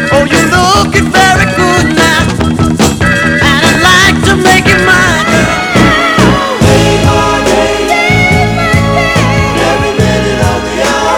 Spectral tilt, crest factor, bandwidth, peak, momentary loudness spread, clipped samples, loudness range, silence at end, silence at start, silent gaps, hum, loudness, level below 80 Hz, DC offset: -4.5 dB/octave; 8 dB; over 20 kHz; 0 dBFS; 4 LU; 2%; 2 LU; 0 s; 0 s; none; none; -7 LUFS; -22 dBFS; under 0.1%